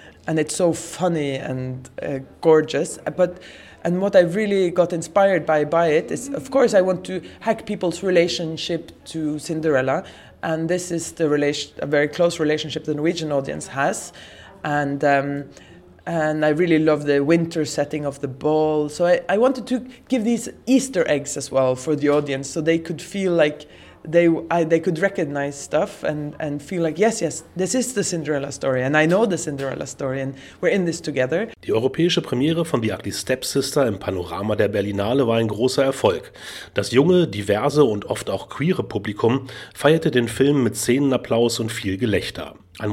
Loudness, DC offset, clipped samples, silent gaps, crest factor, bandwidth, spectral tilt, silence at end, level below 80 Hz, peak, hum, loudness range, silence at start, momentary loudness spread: -21 LUFS; under 0.1%; under 0.1%; none; 20 dB; 16 kHz; -5 dB/octave; 0 s; -56 dBFS; -2 dBFS; none; 3 LU; 0 s; 10 LU